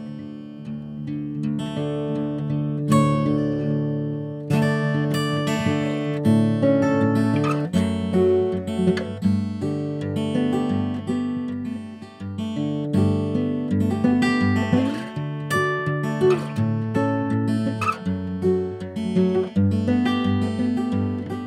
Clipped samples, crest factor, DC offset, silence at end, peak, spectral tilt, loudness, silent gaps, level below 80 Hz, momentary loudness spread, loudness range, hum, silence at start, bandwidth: under 0.1%; 16 dB; under 0.1%; 0 s; -6 dBFS; -7.5 dB/octave; -23 LUFS; none; -56 dBFS; 10 LU; 4 LU; none; 0 s; 14.5 kHz